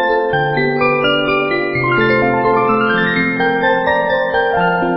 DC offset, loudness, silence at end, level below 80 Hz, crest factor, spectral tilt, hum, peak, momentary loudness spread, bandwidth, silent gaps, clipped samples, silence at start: under 0.1%; -14 LUFS; 0 s; -42 dBFS; 12 dB; -11 dB/octave; none; -2 dBFS; 2 LU; 5.8 kHz; none; under 0.1%; 0 s